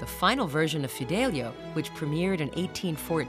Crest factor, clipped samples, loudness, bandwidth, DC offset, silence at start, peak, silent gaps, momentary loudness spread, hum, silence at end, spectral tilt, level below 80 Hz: 18 dB; under 0.1%; -29 LUFS; 15.5 kHz; under 0.1%; 0 s; -10 dBFS; none; 8 LU; none; 0 s; -5 dB/octave; -52 dBFS